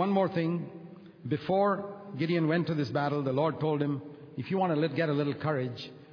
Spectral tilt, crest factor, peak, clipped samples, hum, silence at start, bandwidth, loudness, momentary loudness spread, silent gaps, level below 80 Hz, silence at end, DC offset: -9 dB/octave; 16 dB; -14 dBFS; under 0.1%; none; 0 s; 5.4 kHz; -30 LUFS; 14 LU; none; -72 dBFS; 0 s; under 0.1%